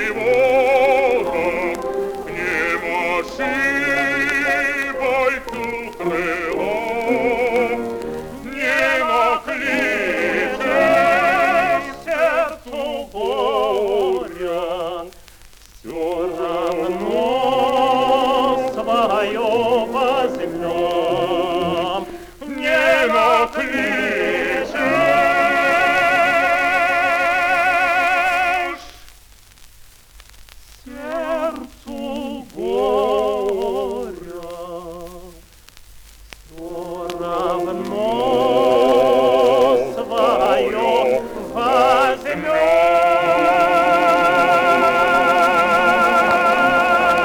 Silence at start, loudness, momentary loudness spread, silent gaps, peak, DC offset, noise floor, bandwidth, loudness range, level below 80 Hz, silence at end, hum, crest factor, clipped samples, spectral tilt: 0 s; -17 LUFS; 12 LU; none; -4 dBFS; under 0.1%; -46 dBFS; 20 kHz; 9 LU; -46 dBFS; 0 s; none; 14 dB; under 0.1%; -4 dB/octave